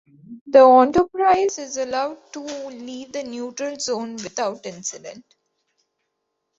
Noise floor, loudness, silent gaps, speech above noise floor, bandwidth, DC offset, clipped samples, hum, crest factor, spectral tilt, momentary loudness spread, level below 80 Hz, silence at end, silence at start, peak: -77 dBFS; -19 LUFS; 0.41-0.46 s; 57 dB; 8 kHz; under 0.1%; under 0.1%; none; 20 dB; -3.5 dB/octave; 20 LU; -58 dBFS; 1.4 s; 0.3 s; -2 dBFS